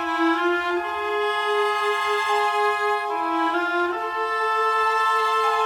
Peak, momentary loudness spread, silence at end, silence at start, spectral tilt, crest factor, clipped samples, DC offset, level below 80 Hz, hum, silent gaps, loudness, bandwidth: -10 dBFS; 5 LU; 0 s; 0 s; -2 dB/octave; 12 dB; under 0.1%; under 0.1%; -62 dBFS; none; none; -22 LUFS; 18 kHz